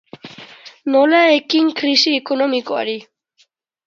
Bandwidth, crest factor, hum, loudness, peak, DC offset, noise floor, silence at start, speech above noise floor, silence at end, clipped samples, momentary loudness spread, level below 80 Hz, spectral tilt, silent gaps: 7.6 kHz; 18 dB; none; -15 LUFS; 0 dBFS; under 0.1%; -60 dBFS; 0.25 s; 45 dB; 0.85 s; under 0.1%; 24 LU; -74 dBFS; -2.5 dB/octave; none